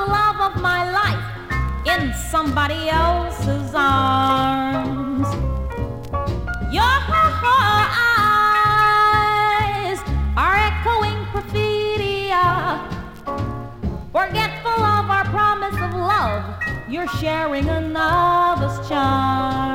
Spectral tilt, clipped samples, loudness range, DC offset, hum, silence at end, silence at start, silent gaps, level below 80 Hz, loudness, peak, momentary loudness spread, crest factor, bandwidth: -5.5 dB/octave; under 0.1%; 5 LU; under 0.1%; none; 0 s; 0 s; none; -32 dBFS; -19 LUFS; -4 dBFS; 11 LU; 14 dB; 17 kHz